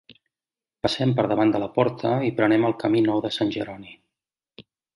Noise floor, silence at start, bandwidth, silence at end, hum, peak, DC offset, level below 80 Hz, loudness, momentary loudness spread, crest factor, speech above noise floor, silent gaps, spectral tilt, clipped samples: under -90 dBFS; 0.85 s; 11.5 kHz; 0.35 s; none; -4 dBFS; under 0.1%; -60 dBFS; -23 LUFS; 8 LU; 20 dB; over 68 dB; none; -7 dB/octave; under 0.1%